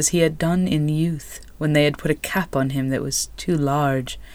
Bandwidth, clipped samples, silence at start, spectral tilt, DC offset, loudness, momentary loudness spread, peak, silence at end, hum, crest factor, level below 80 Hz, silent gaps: 19.5 kHz; under 0.1%; 0 s; -5 dB/octave; under 0.1%; -21 LUFS; 7 LU; -6 dBFS; 0 s; none; 14 dB; -42 dBFS; none